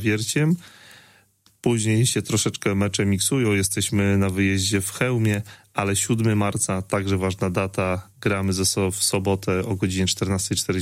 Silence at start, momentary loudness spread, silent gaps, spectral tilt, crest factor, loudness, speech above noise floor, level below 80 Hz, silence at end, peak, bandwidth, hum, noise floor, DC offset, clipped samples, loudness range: 0 s; 4 LU; none; -4.5 dB/octave; 18 dB; -22 LUFS; 37 dB; -52 dBFS; 0 s; -6 dBFS; 16 kHz; none; -59 dBFS; under 0.1%; under 0.1%; 2 LU